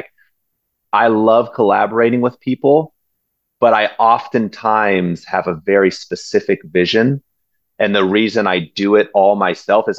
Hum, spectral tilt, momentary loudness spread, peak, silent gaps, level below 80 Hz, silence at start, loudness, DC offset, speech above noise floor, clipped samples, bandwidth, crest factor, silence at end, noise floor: none; -6 dB/octave; 6 LU; 0 dBFS; none; -56 dBFS; 0.95 s; -15 LUFS; under 0.1%; 57 dB; under 0.1%; 8 kHz; 14 dB; 0 s; -71 dBFS